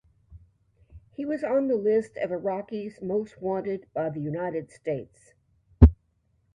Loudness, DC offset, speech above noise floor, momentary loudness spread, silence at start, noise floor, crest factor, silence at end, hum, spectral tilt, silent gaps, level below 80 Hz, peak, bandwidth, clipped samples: -27 LUFS; under 0.1%; 41 dB; 15 LU; 0.3 s; -69 dBFS; 26 dB; 0.6 s; none; -10 dB/octave; none; -32 dBFS; 0 dBFS; 9.4 kHz; under 0.1%